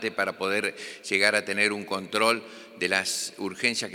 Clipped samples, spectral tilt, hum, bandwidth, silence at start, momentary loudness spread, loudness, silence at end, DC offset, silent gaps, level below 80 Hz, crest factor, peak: under 0.1%; -2 dB/octave; none; 19 kHz; 0 s; 9 LU; -26 LUFS; 0 s; under 0.1%; none; -78 dBFS; 24 dB; -4 dBFS